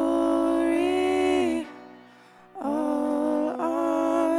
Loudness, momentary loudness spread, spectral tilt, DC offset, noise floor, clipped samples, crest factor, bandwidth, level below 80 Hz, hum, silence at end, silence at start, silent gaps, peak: -25 LUFS; 6 LU; -4.5 dB/octave; under 0.1%; -52 dBFS; under 0.1%; 14 dB; 12 kHz; -58 dBFS; none; 0 s; 0 s; none; -10 dBFS